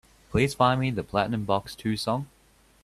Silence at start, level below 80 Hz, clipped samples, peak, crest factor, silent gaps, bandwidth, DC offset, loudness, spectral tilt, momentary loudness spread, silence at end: 0.3 s; -50 dBFS; under 0.1%; -6 dBFS; 20 dB; none; 14.5 kHz; under 0.1%; -26 LUFS; -6 dB/octave; 8 LU; 0.55 s